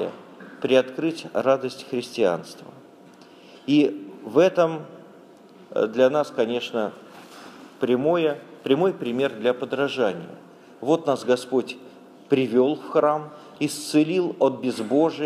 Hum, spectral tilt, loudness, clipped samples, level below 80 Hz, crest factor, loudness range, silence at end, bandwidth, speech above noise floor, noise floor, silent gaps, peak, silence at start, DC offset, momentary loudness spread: none; -5.5 dB/octave; -23 LUFS; under 0.1%; -76 dBFS; 20 dB; 2 LU; 0 s; 14.5 kHz; 26 dB; -48 dBFS; none; -4 dBFS; 0 s; under 0.1%; 19 LU